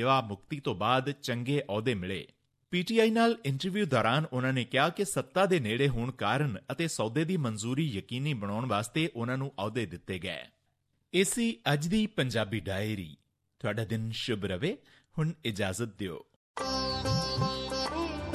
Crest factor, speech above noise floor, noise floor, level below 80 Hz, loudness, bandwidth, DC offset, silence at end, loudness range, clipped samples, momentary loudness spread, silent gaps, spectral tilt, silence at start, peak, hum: 18 dB; 46 dB; -76 dBFS; -54 dBFS; -31 LUFS; 14.5 kHz; under 0.1%; 0 s; 6 LU; under 0.1%; 10 LU; 16.36-16.54 s; -5 dB/octave; 0 s; -12 dBFS; none